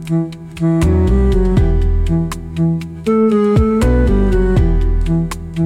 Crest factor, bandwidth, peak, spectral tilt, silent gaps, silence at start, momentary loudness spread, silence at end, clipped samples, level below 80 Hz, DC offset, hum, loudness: 10 dB; 12.5 kHz; -2 dBFS; -8.5 dB/octave; none; 0 s; 7 LU; 0 s; under 0.1%; -18 dBFS; under 0.1%; none; -15 LUFS